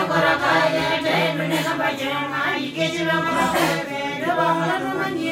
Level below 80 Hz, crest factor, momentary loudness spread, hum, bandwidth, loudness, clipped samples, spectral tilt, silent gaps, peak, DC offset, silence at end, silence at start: -56 dBFS; 14 dB; 6 LU; none; 16 kHz; -21 LUFS; under 0.1%; -4.5 dB/octave; none; -6 dBFS; under 0.1%; 0 s; 0 s